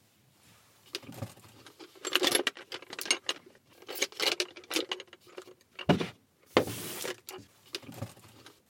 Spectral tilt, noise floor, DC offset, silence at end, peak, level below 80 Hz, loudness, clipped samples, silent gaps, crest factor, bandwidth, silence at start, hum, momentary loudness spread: -2.5 dB/octave; -64 dBFS; under 0.1%; 0.2 s; -4 dBFS; -68 dBFS; -32 LUFS; under 0.1%; none; 32 dB; 17 kHz; 0.95 s; none; 21 LU